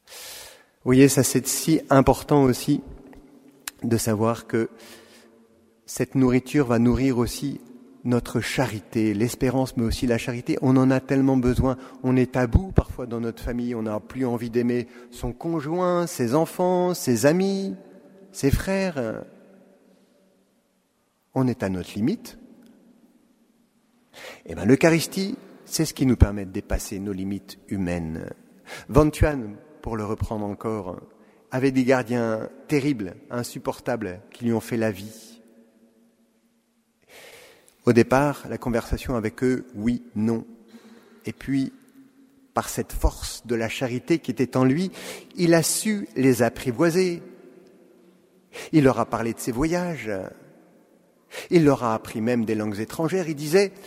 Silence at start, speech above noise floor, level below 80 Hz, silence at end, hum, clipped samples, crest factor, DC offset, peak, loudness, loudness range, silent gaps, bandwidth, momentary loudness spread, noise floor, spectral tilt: 0.1 s; 45 dB; -38 dBFS; 0 s; none; under 0.1%; 24 dB; under 0.1%; 0 dBFS; -24 LUFS; 8 LU; none; 16 kHz; 16 LU; -68 dBFS; -6 dB/octave